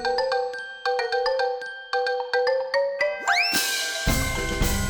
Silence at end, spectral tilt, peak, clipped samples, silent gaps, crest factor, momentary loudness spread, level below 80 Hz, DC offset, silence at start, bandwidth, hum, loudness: 0 s; -3 dB/octave; -10 dBFS; under 0.1%; none; 14 dB; 7 LU; -36 dBFS; under 0.1%; 0 s; over 20 kHz; none; -24 LUFS